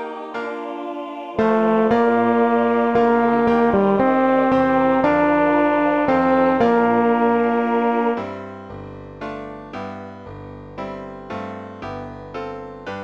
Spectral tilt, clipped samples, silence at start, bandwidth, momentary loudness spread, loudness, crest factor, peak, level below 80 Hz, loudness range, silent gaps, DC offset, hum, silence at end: -8 dB/octave; under 0.1%; 0 s; 7 kHz; 17 LU; -18 LUFS; 16 dB; -4 dBFS; -50 dBFS; 16 LU; none; under 0.1%; none; 0 s